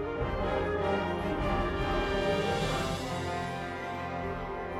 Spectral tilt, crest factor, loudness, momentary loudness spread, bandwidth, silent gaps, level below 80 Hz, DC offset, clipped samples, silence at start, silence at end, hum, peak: -5.5 dB/octave; 14 dB; -32 LUFS; 7 LU; 15.5 kHz; none; -42 dBFS; under 0.1%; under 0.1%; 0 s; 0 s; none; -18 dBFS